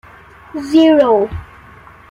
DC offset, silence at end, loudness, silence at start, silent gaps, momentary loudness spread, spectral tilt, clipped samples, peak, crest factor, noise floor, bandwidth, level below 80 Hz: under 0.1%; 0.65 s; -12 LUFS; 0.55 s; none; 20 LU; -6.5 dB/octave; under 0.1%; -2 dBFS; 14 dB; -40 dBFS; 11 kHz; -42 dBFS